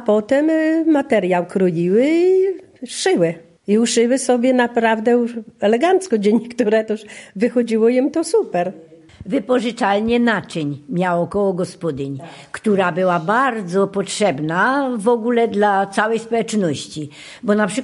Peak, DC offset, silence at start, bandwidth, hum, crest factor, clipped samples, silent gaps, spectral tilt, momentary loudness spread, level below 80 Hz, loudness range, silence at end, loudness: -2 dBFS; under 0.1%; 0 s; 11.5 kHz; none; 16 dB; under 0.1%; none; -5.5 dB/octave; 10 LU; -56 dBFS; 3 LU; 0 s; -18 LUFS